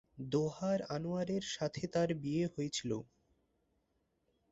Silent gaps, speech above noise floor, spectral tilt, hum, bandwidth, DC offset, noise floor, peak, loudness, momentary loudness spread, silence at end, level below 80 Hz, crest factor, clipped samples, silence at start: none; 43 dB; -6 dB/octave; none; 8 kHz; under 0.1%; -80 dBFS; -22 dBFS; -37 LUFS; 4 LU; 1.5 s; -68 dBFS; 18 dB; under 0.1%; 0.15 s